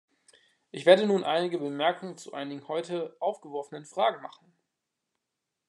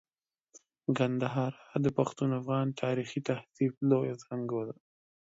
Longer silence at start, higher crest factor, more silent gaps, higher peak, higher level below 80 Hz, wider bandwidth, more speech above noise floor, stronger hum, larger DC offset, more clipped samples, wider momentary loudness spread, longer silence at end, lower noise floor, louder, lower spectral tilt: second, 0.75 s vs 0.9 s; first, 24 dB vs 18 dB; second, none vs 3.77-3.81 s; first, -6 dBFS vs -14 dBFS; second, -90 dBFS vs -70 dBFS; first, 11 kHz vs 7.8 kHz; first, 57 dB vs 44 dB; neither; neither; neither; first, 17 LU vs 8 LU; first, 1.4 s vs 0.65 s; first, -85 dBFS vs -75 dBFS; first, -28 LUFS vs -32 LUFS; second, -5 dB/octave vs -7.5 dB/octave